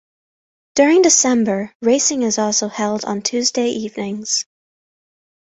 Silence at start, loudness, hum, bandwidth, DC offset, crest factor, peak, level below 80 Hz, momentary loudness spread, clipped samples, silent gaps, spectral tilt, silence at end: 0.75 s; -17 LUFS; none; 8.4 kHz; under 0.1%; 18 dB; 0 dBFS; -62 dBFS; 12 LU; under 0.1%; 1.75-1.80 s; -2.5 dB/octave; 1 s